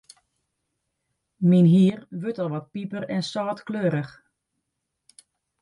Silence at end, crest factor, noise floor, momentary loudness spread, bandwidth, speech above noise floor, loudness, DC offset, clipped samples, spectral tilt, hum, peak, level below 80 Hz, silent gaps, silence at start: 1.5 s; 18 dB; -80 dBFS; 15 LU; 11 kHz; 58 dB; -23 LUFS; under 0.1%; under 0.1%; -8 dB/octave; none; -8 dBFS; -70 dBFS; none; 1.4 s